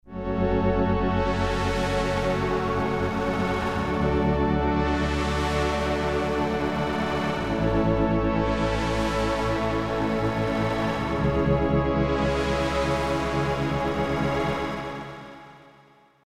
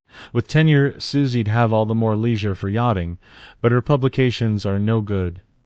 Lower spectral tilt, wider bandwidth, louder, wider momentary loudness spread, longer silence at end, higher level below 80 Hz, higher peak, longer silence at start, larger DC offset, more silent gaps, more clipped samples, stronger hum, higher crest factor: second, -6.5 dB/octave vs -8 dB/octave; first, 15 kHz vs 8 kHz; second, -25 LUFS vs -20 LUFS; second, 3 LU vs 8 LU; first, 0.7 s vs 0.25 s; first, -34 dBFS vs -46 dBFS; second, -10 dBFS vs -4 dBFS; about the same, 0.05 s vs 0.15 s; neither; neither; neither; neither; about the same, 16 dB vs 16 dB